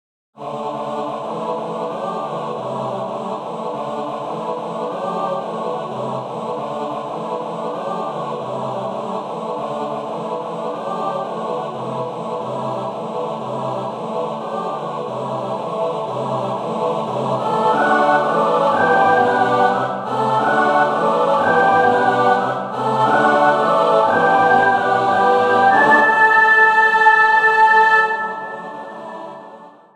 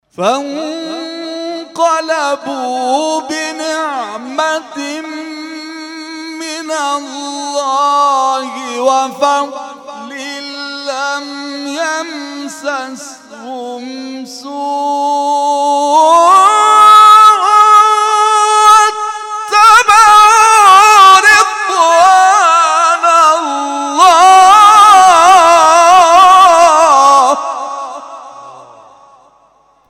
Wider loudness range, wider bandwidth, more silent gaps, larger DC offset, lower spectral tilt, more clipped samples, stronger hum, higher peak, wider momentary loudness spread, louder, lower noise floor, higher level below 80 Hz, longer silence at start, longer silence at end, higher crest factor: second, 12 LU vs 15 LU; second, 12 kHz vs 17 kHz; neither; neither; first, -5.5 dB/octave vs -0.5 dB/octave; second, under 0.1% vs 0.5%; neither; about the same, 0 dBFS vs 0 dBFS; second, 14 LU vs 20 LU; second, -17 LUFS vs -7 LUFS; second, -40 dBFS vs -50 dBFS; second, -64 dBFS vs -54 dBFS; first, 0.4 s vs 0.2 s; second, 0.25 s vs 1.4 s; first, 18 dB vs 10 dB